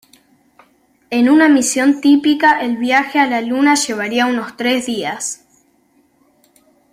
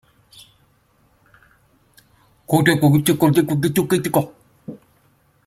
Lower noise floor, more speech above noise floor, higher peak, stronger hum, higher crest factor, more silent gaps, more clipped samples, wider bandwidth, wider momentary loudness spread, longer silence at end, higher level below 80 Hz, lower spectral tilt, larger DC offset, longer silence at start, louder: about the same, -57 dBFS vs -59 dBFS; about the same, 43 dB vs 43 dB; about the same, -2 dBFS vs 0 dBFS; neither; second, 14 dB vs 20 dB; neither; neither; about the same, 15.5 kHz vs 16.5 kHz; second, 11 LU vs 24 LU; first, 1.55 s vs 0.7 s; about the same, -60 dBFS vs -56 dBFS; second, -2.5 dB/octave vs -6 dB/octave; neither; second, 1.1 s vs 2.5 s; first, -14 LUFS vs -17 LUFS